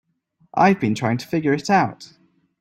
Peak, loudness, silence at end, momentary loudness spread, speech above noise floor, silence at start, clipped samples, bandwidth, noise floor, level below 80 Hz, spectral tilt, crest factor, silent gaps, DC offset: -2 dBFS; -20 LUFS; 0.55 s; 7 LU; 43 dB; 0.55 s; under 0.1%; 15 kHz; -63 dBFS; -60 dBFS; -6.5 dB/octave; 18 dB; none; under 0.1%